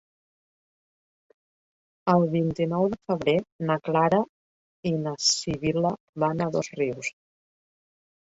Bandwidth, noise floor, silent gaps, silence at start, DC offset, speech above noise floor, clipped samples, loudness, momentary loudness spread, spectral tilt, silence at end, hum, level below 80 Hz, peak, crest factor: 8 kHz; under -90 dBFS; 3.52-3.59 s, 4.29-4.83 s, 6.00-6.13 s; 2.05 s; under 0.1%; over 65 dB; under 0.1%; -26 LUFS; 8 LU; -5 dB/octave; 1.2 s; none; -60 dBFS; -6 dBFS; 20 dB